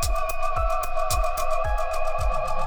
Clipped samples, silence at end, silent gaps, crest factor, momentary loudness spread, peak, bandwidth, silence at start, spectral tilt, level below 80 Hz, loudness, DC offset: under 0.1%; 0 s; none; 12 dB; 2 LU; -10 dBFS; 19.5 kHz; 0 s; -3 dB/octave; -26 dBFS; -26 LUFS; under 0.1%